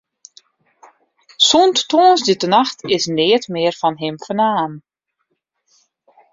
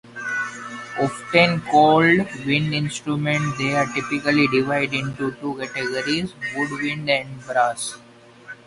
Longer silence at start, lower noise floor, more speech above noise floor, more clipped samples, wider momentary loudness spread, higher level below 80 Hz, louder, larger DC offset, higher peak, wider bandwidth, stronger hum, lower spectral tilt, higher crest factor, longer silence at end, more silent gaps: first, 1.4 s vs 0.05 s; first, -72 dBFS vs -42 dBFS; first, 56 dB vs 22 dB; neither; about the same, 9 LU vs 11 LU; about the same, -62 dBFS vs -58 dBFS; first, -15 LUFS vs -21 LUFS; neither; about the same, 0 dBFS vs -2 dBFS; second, 7.8 kHz vs 11.5 kHz; neither; second, -3.5 dB/octave vs -5 dB/octave; about the same, 18 dB vs 20 dB; first, 1.55 s vs 0.15 s; neither